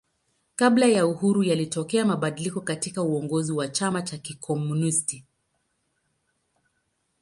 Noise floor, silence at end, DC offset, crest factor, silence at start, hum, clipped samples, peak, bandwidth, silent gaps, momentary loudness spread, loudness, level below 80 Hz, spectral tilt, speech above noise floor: -74 dBFS; 2 s; under 0.1%; 18 dB; 0.6 s; none; under 0.1%; -6 dBFS; 11.5 kHz; none; 11 LU; -24 LUFS; -68 dBFS; -5 dB/octave; 50 dB